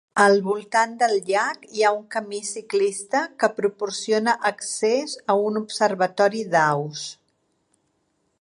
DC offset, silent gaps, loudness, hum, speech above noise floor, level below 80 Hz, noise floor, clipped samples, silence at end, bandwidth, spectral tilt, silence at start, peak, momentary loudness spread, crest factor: under 0.1%; none; -22 LUFS; none; 48 dB; -78 dBFS; -70 dBFS; under 0.1%; 1.3 s; 11.5 kHz; -3.5 dB/octave; 0.15 s; -4 dBFS; 8 LU; 20 dB